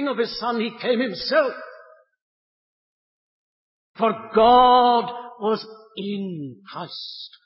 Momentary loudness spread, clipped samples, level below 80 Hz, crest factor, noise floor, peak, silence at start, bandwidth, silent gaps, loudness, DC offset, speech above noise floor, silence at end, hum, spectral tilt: 20 LU; under 0.1%; -56 dBFS; 18 dB; -49 dBFS; -4 dBFS; 0 s; 5.8 kHz; 2.22-3.94 s; -20 LUFS; under 0.1%; 28 dB; 0.2 s; none; -8.5 dB/octave